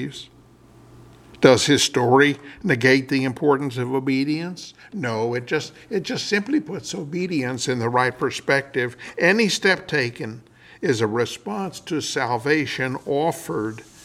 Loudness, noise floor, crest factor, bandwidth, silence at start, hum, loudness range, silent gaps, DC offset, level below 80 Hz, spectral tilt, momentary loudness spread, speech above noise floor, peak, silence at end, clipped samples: -21 LUFS; -50 dBFS; 22 dB; 15.5 kHz; 0 s; none; 6 LU; none; under 0.1%; -60 dBFS; -4.5 dB/octave; 12 LU; 28 dB; 0 dBFS; 0.2 s; under 0.1%